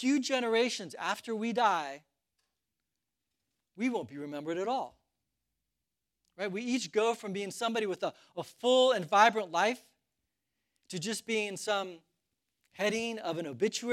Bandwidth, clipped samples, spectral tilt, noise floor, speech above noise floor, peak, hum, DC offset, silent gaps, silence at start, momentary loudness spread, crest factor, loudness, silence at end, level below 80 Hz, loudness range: 15.5 kHz; under 0.1%; -3.5 dB/octave; -88 dBFS; 56 dB; -10 dBFS; none; under 0.1%; none; 0 s; 14 LU; 24 dB; -31 LUFS; 0 s; -84 dBFS; 10 LU